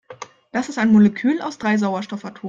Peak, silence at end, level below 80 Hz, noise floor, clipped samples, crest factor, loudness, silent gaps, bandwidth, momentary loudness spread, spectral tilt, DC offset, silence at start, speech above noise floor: -6 dBFS; 0 s; -60 dBFS; -40 dBFS; under 0.1%; 14 dB; -19 LUFS; none; 7.6 kHz; 16 LU; -6.5 dB/octave; under 0.1%; 0.1 s; 21 dB